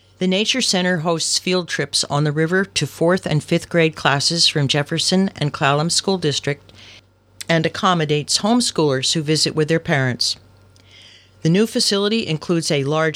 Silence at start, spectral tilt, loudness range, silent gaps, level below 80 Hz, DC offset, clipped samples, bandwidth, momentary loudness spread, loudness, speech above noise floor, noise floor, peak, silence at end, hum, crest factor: 0.2 s; -4 dB/octave; 2 LU; none; -56 dBFS; under 0.1%; under 0.1%; 15.5 kHz; 5 LU; -18 LUFS; 30 dB; -49 dBFS; -2 dBFS; 0 s; none; 18 dB